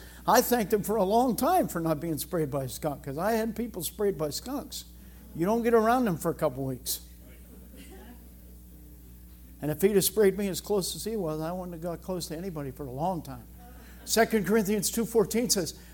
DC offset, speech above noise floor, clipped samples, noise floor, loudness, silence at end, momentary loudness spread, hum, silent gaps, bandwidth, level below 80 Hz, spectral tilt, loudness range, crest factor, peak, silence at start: under 0.1%; 21 dB; under 0.1%; -49 dBFS; -28 LUFS; 0 s; 17 LU; 60 Hz at -50 dBFS; none; 17.5 kHz; -50 dBFS; -4.5 dB/octave; 6 LU; 22 dB; -8 dBFS; 0 s